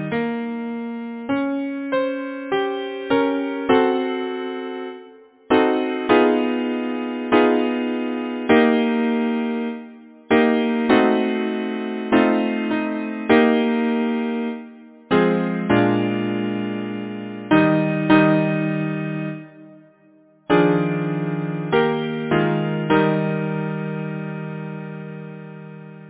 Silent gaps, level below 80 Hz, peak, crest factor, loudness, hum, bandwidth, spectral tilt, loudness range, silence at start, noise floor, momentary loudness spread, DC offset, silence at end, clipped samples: none; -56 dBFS; -2 dBFS; 20 dB; -20 LUFS; none; 4 kHz; -10.5 dB/octave; 3 LU; 0 s; -53 dBFS; 14 LU; under 0.1%; 0 s; under 0.1%